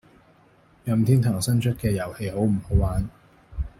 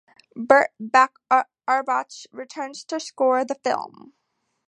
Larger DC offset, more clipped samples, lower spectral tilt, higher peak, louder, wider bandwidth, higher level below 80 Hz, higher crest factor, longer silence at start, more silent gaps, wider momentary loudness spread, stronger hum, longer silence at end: neither; neither; first, -7 dB/octave vs -3 dB/octave; second, -6 dBFS vs 0 dBFS; second, -24 LUFS vs -21 LUFS; first, 16 kHz vs 10.5 kHz; first, -36 dBFS vs -72 dBFS; about the same, 18 dB vs 22 dB; first, 0.85 s vs 0.35 s; neither; second, 15 LU vs 19 LU; neither; second, 0.1 s vs 0.8 s